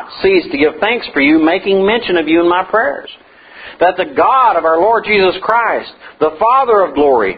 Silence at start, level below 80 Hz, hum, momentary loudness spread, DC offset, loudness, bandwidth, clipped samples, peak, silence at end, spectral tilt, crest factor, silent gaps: 0 s; -46 dBFS; none; 7 LU; under 0.1%; -12 LUFS; 5 kHz; under 0.1%; 0 dBFS; 0 s; -8 dB/octave; 12 dB; none